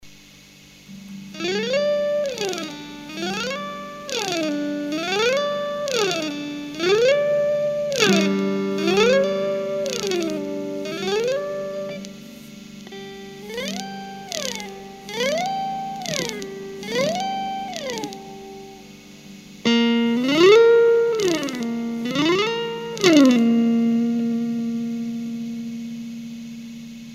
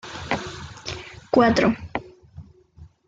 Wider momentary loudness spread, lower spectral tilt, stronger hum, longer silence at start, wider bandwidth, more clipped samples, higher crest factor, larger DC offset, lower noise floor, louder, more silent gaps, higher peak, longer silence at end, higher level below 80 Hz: first, 20 LU vs 17 LU; second, -4 dB/octave vs -5.5 dB/octave; first, 50 Hz at -50 dBFS vs none; about the same, 0.05 s vs 0.05 s; first, 15.5 kHz vs 7.8 kHz; neither; about the same, 22 dB vs 20 dB; neither; about the same, -47 dBFS vs -49 dBFS; about the same, -21 LUFS vs -23 LUFS; neither; first, 0 dBFS vs -6 dBFS; second, 0 s vs 0.25 s; second, -60 dBFS vs -48 dBFS